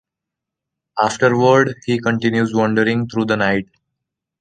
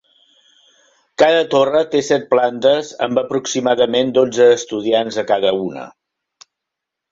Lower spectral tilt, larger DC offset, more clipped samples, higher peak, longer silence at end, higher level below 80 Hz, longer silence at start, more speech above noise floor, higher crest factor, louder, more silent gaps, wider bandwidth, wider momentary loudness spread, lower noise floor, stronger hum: first, -6 dB/octave vs -4 dB/octave; neither; neither; about the same, -2 dBFS vs -2 dBFS; second, 0.8 s vs 1.25 s; first, -54 dBFS vs -60 dBFS; second, 0.95 s vs 1.2 s; about the same, 67 dB vs 66 dB; about the same, 16 dB vs 16 dB; about the same, -17 LUFS vs -16 LUFS; neither; first, 9.6 kHz vs 7.8 kHz; about the same, 7 LU vs 7 LU; about the same, -83 dBFS vs -81 dBFS; neither